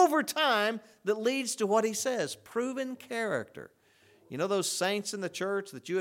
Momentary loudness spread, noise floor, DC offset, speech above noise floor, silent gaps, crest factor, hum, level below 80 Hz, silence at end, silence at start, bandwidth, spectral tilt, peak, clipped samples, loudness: 9 LU; -63 dBFS; under 0.1%; 32 dB; none; 20 dB; none; -82 dBFS; 0 s; 0 s; 18.5 kHz; -3 dB/octave; -12 dBFS; under 0.1%; -31 LUFS